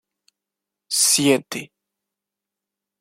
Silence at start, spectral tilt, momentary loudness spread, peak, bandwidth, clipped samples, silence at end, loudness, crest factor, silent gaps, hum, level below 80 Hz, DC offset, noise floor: 0.9 s; -2 dB/octave; 17 LU; -4 dBFS; 16.5 kHz; under 0.1%; 1.35 s; -17 LUFS; 22 dB; none; none; -72 dBFS; under 0.1%; -86 dBFS